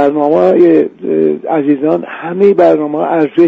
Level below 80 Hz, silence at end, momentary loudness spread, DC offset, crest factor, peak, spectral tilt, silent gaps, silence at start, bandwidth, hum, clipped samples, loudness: -56 dBFS; 0 s; 7 LU; under 0.1%; 10 dB; 0 dBFS; -9 dB/octave; none; 0 s; 5.4 kHz; none; under 0.1%; -11 LUFS